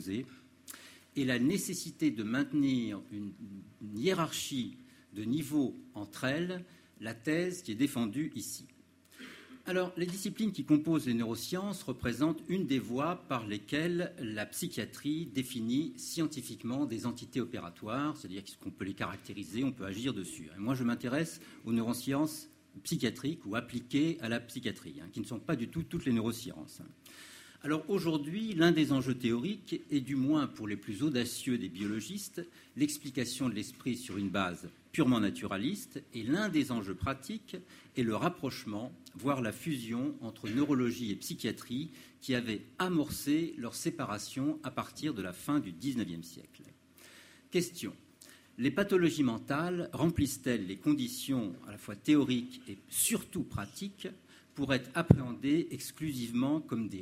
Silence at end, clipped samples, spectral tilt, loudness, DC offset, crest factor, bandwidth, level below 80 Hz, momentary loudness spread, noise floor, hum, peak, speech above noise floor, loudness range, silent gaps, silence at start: 0 s; under 0.1%; -5 dB/octave; -35 LUFS; under 0.1%; 30 dB; 16 kHz; -62 dBFS; 14 LU; -58 dBFS; none; -6 dBFS; 24 dB; 5 LU; none; 0 s